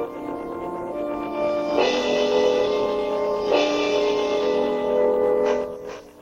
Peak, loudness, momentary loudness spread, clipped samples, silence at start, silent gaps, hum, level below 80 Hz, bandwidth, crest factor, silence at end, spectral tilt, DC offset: -6 dBFS; -22 LUFS; 11 LU; under 0.1%; 0 s; none; none; -54 dBFS; 10 kHz; 16 dB; 0 s; -4 dB/octave; under 0.1%